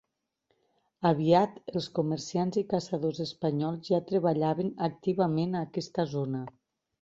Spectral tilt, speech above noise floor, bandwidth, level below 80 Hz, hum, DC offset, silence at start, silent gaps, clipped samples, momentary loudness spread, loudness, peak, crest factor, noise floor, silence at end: -7 dB/octave; 48 dB; 7.8 kHz; -68 dBFS; none; under 0.1%; 1 s; none; under 0.1%; 8 LU; -30 LUFS; -10 dBFS; 20 dB; -77 dBFS; 0.5 s